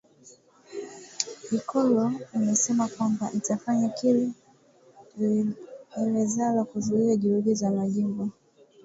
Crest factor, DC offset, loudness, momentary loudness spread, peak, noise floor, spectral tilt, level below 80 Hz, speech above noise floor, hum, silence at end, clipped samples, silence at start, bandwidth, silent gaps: 22 dB; under 0.1%; -26 LUFS; 15 LU; -6 dBFS; -58 dBFS; -5.5 dB/octave; -70 dBFS; 33 dB; none; 0.55 s; under 0.1%; 0.25 s; 8 kHz; none